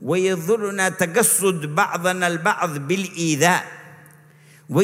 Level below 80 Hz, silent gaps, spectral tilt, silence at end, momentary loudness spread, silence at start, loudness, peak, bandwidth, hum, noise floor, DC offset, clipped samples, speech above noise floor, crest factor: -70 dBFS; none; -3.5 dB/octave; 0 s; 7 LU; 0 s; -20 LUFS; -2 dBFS; 16 kHz; none; -50 dBFS; under 0.1%; under 0.1%; 29 dB; 18 dB